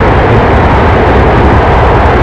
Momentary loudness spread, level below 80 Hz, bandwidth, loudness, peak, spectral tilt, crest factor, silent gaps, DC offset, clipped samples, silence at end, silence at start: 0 LU; -12 dBFS; 8 kHz; -6 LUFS; 0 dBFS; -8 dB/octave; 6 dB; none; 2%; 2%; 0 s; 0 s